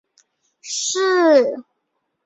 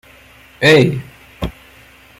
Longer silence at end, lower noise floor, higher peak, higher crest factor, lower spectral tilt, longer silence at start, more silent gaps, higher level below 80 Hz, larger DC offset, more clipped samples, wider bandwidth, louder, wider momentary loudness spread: about the same, 0.65 s vs 0.7 s; first, -74 dBFS vs -44 dBFS; about the same, -2 dBFS vs 0 dBFS; about the same, 18 dB vs 18 dB; second, -1 dB/octave vs -5.5 dB/octave; about the same, 0.65 s vs 0.6 s; neither; second, -72 dBFS vs -38 dBFS; neither; neither; second, 8.4 kHz vs 16 kHz; second, -17 LUFS vs -12 LUFS; second, 13 LU vs 17 LU